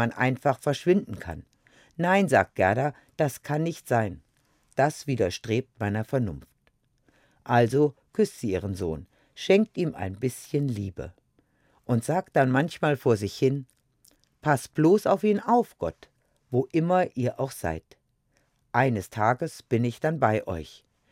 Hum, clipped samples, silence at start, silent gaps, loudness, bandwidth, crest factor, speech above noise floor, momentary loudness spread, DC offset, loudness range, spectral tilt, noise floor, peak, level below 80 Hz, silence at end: none; under 0.1%; 0 s; none; -26 LUFS; 16.5 kHz; 20 dB; 44 dB; 13 LU; under 0.1%; 4 LU; -6.5 dB/octave; -70 dBFS; -6 dBFS; -58 dBFS; 0.4 s